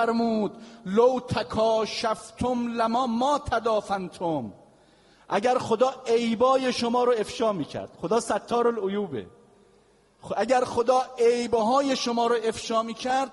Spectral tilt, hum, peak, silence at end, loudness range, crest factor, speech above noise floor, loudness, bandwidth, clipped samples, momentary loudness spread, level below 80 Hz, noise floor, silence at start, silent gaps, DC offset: -4.5 dB/octave; none; -10 dBFS; 0 s; 3 LU; 16 dB; 35 dB; -25 LUFS; 11.5 kHz; under 0.1%; 8 LU; -58 dBFS; -60 dBFS; 0 s; none; under 0.1%